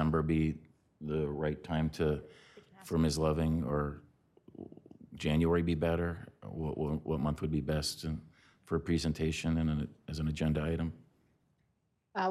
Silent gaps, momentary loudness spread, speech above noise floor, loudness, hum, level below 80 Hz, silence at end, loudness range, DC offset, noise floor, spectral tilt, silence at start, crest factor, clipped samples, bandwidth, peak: none; 16 LU; 45 dB; -34 LUFS; none; -50 dBFS; 0 s; 2 LU; under 0.1%; -78 dBFS; -6.5 dB/octave; 0 s; 16 dB; under 0.1%; 13.5 kHz; -18 dBFS